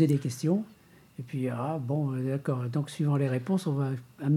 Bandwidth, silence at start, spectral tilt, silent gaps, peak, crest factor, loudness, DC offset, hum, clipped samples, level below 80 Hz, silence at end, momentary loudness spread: 14 kHz; 0 s; -8 dB/octave; none; -12 dBFS; 18 dB; -30 LUFS; under 0.1%; none; under 0.1%; -72 dBFS; 0 s; 7 LU